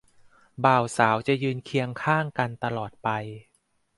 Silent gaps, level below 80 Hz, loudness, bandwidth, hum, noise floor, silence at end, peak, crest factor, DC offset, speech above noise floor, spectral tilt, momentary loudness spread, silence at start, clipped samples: none; -64 dBFS; -25 LUFS; 11.5 kHz; none; -57 dBFS; 0.55 s; -4 dBFS; 22 dB; under 0.1%; 31 dB; -6 dB/octave; 9 LU; 0.6 s; under 0.1%